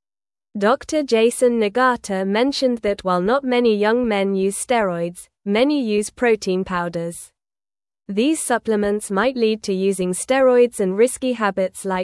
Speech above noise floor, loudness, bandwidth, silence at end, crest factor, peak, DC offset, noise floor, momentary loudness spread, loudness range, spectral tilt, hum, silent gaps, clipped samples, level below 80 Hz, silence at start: over 71 dB; -19 LUFS; 12 kHz; 0 s; 16 dB; -4 dBFS; under 0.1%; under -90 dBFS; 7 LU; 4 LU; -4.5 dB/octave; none; none; under 0.1%; -54 dBFS; 0.55 s